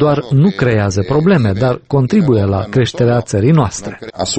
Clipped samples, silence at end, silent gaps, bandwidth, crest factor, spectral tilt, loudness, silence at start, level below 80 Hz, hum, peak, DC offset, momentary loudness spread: under 0.1%; 0 s; none; 8.8 kHz; 12 dB; -6.5 dB/octave; -13 LUFS; 0 s; -40 dBFS; none; 0 dBFS; under 0.1%; 5 LU